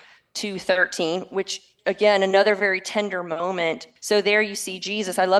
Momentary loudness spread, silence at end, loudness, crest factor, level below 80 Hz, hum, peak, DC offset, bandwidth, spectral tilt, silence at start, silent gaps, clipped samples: 10 LU; 0 s; -22 LUFS; 18 dB; -70 dBFS; none; -6 dBFS; under 0.1%; 12.5 kHz; -3 dB/octave; 0.35 s; none; under 0.1%